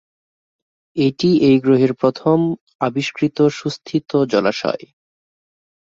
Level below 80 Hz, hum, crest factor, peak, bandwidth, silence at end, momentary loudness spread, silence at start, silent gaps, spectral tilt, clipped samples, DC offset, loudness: -58 dBFS; none; 16 dB; -2 dBFS; 7.6 kHz; 1.15 s; 10 LU; 0.95 s; 2.61-2.67 s, 2.75-2.79 s; -7 dB/octave; under 0.1%; under 0.1%; -17 LUFS